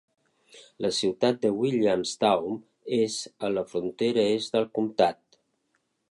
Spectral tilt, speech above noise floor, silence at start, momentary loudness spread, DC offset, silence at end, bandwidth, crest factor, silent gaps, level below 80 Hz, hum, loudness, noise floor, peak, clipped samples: -4.5 dB/octave; 49 dB; 0.55 s; 7 LU; under 0.1%; 1 s; 11.5 kHz; 20 dB; none; -68 dBFS; none; -26 LUFS; -75 dBFS; -6 dBFS; under 0.1%